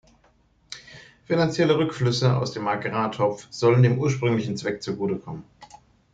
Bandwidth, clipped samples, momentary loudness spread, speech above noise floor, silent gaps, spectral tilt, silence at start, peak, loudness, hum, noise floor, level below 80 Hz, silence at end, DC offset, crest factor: 7.8 kHz; under 0.1%; 20 LU; 39 dB; none; -6.5 dB/octave; 0.7 s; -8 dBFS; -23 LUFS; none; -61 dBFS; -58 dBFS; 0.5 s; under 0.1%; 16 dB